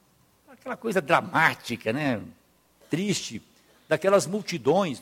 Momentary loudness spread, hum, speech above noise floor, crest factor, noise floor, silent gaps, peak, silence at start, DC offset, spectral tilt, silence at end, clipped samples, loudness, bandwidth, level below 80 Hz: 12 LU; none; 36 dB; 22 dB; -61 dBFS; none; -4 dBFS; 0.5 s; under 0.1%; -4.5 dB/octave; 0 s; under 0.1%; -25 LUFS; 16.5 kHz; -66 dBFS